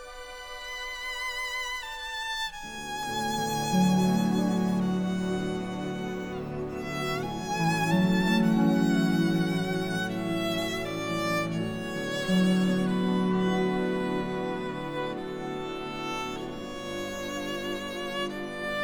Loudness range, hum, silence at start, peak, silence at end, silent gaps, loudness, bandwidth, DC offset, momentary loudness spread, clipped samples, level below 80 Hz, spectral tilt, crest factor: 8 LU; none; 0 s; -14 dBFS; 0 s; none; -29 LUFS; 20 kHz; under 0.1%; 11 LU; under 0.1%; -52 dBFS; -5.5 dB/octave; 16 dB